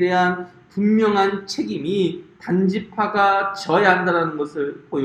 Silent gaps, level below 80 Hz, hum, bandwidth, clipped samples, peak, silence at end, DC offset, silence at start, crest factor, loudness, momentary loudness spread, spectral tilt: none; -62 dBFS; none; 9.8 kHz; under 0.1%; 0 dBFS; 0 s; under 0.1%; 0 s; 18 dB; -20 LUFS; 9 LU; -6 dB/octave